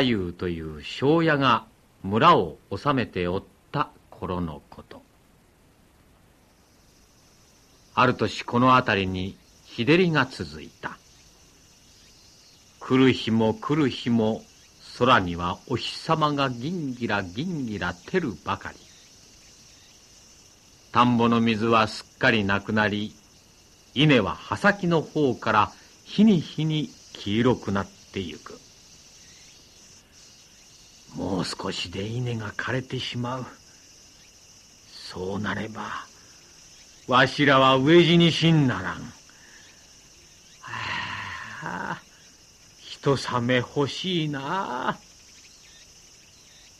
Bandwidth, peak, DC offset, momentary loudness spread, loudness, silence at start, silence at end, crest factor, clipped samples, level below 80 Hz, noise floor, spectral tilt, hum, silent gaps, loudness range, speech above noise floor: 13.5 kHz; -6 dBFS; under 0.1%; 17 LU; -24 LUFS; 0 s; 1.85 s; 20 dB; under 0.1%; -56 dBFS; -58 dBFS; -6 dB/octave; none; none; 14 LU; 35 dB